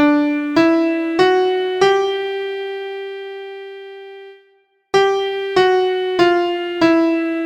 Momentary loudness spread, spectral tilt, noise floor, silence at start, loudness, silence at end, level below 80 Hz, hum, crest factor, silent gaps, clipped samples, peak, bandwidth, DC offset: 17 LU; -4.5 dB/octave; -57 dBFS; 0 s; -16 LUFS; 0 s; -58 dBFS; none; 16 dB; none; under 0.1%; 0 dBFS; 9.2 kHz; under 0.1%